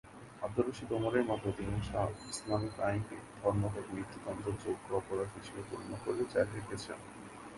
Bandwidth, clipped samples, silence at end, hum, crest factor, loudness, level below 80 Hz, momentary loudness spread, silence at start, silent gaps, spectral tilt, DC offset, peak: 11.5 kHz; under 0.1%; 0 s; none; 20 dB; -37 LUFS; -56 dBFS; 11 LU; 0.05 s; none; -6 dB/octave; under 0.1%; -16 dBFS